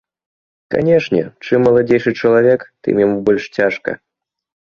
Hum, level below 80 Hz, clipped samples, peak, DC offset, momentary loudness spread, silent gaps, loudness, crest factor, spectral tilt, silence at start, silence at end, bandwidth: none; -52 dBFS; under 0.1%; -2 dBFS; under 0.1%; 8 LU; none; -15 LUFS; 14 dB; -7.5 dB/octave; 0.7 s; 0.7 s; 6.8 kHz